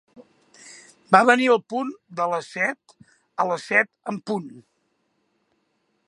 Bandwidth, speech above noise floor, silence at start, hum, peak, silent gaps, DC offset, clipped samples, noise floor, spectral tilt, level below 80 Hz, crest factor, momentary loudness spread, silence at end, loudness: 11.5 kHz; 49 dB; 0.2 s; none; 0 dBFS; none; under 0.1%; under 0.1%; -71 dBFS; -4.5 dB/octave; -76 dBFS; 24 dB; 16 LU; 1.5 s; -22 LUFS